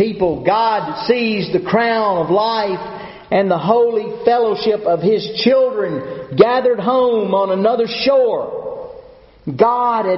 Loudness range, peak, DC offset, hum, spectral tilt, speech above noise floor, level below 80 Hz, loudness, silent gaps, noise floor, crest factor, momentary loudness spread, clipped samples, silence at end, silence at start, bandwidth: 2 LU; 0 dBFS; under 0.1%; none; -4 dB/octave; 26 dB; -52 dBFS; -16 LUFS; none; -41 dBFS; 16 dB; 11 LU; under 0.1%; 0 s; 0 s; 6 kHz